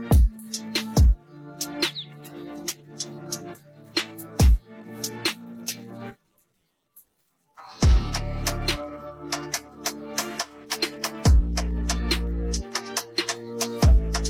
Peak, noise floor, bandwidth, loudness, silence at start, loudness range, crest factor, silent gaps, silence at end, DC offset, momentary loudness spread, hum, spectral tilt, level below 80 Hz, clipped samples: -10 dBFS; -73 dBFS; 17 kHz; -26 LUFS; 0 s; 4 LU; 16 dB; none; 0 s; under 0.1%; 16 LU; none; -4.5 dB/octave; -26 dBFS; under 0.1%